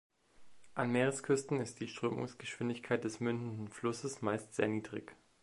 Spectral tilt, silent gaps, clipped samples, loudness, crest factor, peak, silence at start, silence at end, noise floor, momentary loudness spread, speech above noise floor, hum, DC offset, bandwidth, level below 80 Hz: -5.5 dB/octave; none; under 0.1%; -37 LUFS; 20 dB; -18 dBFS; 0.4 s; 0.3 s; -58 dBFS; 10 LU; 22 dB; none; under 0.1%; 11.5 kHz; -74 dBFS